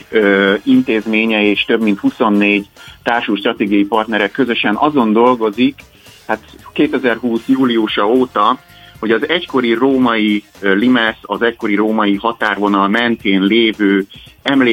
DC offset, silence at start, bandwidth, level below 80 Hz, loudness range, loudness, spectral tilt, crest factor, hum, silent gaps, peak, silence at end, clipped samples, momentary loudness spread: under 0.1%; 0.1 s; 16 kHz; -52 dBFS; 1 LU; -14 LUFS; -6.5 dB/octave; 14 dB; none; none; 0 dBFS; 0 s; under 0.1%; 6 LU